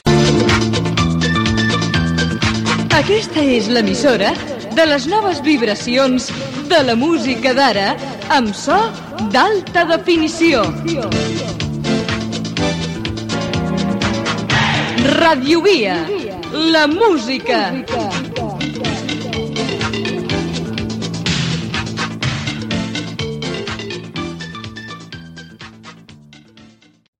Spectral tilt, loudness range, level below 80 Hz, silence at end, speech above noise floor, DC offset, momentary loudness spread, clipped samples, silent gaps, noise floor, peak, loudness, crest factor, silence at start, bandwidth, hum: -5 dB/octave; 8 LU; -38 dBFS; 0.55 s; 32 dB; under 0.1%; 11 LU; under 0.1%; none; -46 dBFS; -4 dBFS; -16 LUFS; 14 dB; 0.05 s; 15 kHz; none